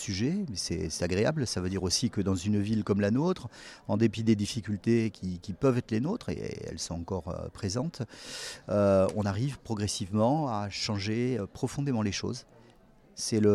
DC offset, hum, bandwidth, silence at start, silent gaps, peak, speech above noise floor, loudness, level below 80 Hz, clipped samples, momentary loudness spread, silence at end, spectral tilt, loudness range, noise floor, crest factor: under 0.1%; none; 13.5 kHz; 0 s; none; -12 dBFS; 29 dB; -30 LUFS; -56 dBFS; under 0.1%; 11 LU; 0 s; -5.5 dB/octave; 3 LU; -58 dBFS; 18 dB